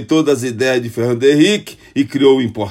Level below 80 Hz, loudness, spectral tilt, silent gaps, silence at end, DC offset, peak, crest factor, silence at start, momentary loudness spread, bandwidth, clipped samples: -56 dBFS; -14 LUFS; -5.5 dB/octave; none; 0 s; under 0.1%; 0 dBFS; 14 dB; 0 s; 8 LU; 15.5 kHz; under 0.1%